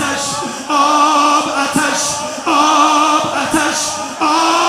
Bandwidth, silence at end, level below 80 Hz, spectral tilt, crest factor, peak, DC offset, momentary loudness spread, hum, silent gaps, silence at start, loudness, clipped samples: 15.5 kHz; 0 s; -52 dBFS; -2 dB/octave; 14 dB; 0 dBFS; under 0.1%; 7 LU; none; none; 0 s; -13 LUFS; under 0.1%